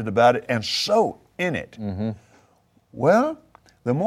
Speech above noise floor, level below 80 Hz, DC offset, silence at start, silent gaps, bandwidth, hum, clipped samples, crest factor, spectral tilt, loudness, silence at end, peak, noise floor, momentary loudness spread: 39 dB; -60 dBFS; under 0.1%; 0 s; none; 15.5 kHz; none; under 0.1%; 18 dB; -5 dB/octave; -22 LUFS; 0 s; -6 dBFS; -61 dBFS; 14 LU